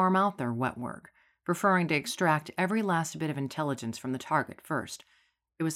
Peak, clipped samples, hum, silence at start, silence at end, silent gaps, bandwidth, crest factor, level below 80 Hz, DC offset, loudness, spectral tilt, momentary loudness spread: -12 dBFS; under 0.1%; none; 0 s; 0 s; none; 16 kHz; 18 dB; -70 dBFS; under 0.1%; -30 LUFS; -5.5 dB/octave; 14 LU